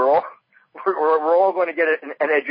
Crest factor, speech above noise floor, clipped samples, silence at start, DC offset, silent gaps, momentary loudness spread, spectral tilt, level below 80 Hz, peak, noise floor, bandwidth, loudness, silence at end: 14 dB; 28 dB; under 0.1%; 0 s; under 0.1%; none; 8 LU; -8.5 dB/octave; -72 dBFS; -6 dBFS; -46 dBFS; 5.2 kHz; -20 LUFS; 0 s